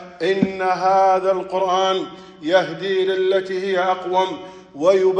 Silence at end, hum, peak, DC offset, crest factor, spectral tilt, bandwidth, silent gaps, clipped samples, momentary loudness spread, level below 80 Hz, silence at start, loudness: 0 s; none; -2 dBFS; under 0.1%; 16 dB; -5 dB/octave; 8.8 kHz; none; under 0.1%; 9 LU; -62 dBFS; 0 s; -19 LUFS